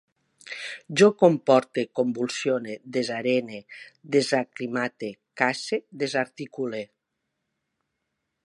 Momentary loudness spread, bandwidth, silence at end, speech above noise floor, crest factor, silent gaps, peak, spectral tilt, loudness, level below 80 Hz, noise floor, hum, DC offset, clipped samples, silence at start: 17 LU; 11.5 kHz; 1.6 s; 56 dB; 22 dB; none; -4 dBFS; -5 dB/octave; -25 LUFS; -78 dBFS; -81 dBFS; none; under 0.1%; under 0.1%; 0.45 s